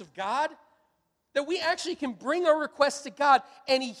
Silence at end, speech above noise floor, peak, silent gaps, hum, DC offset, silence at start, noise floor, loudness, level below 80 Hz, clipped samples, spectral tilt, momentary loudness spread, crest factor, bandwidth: 0 s; 47 dB; -8 dBFS; none; none; under 0.1%; 0 s; -74 dBFS; -27 LUFS; -74 dBFS; under 0.1%; -2 dB/octave; 10 LU; 20 dB; 13.5 kHz